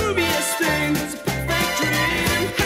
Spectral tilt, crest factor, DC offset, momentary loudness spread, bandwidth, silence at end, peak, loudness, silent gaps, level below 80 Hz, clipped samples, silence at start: -3.5 dB/octave; 12 dB; under 0.1%; 4 LU; 16.5 kHz; 0 s; -10 dBFS; -20 LUFS; none; -38 dBFS; under 0.1%; 0 s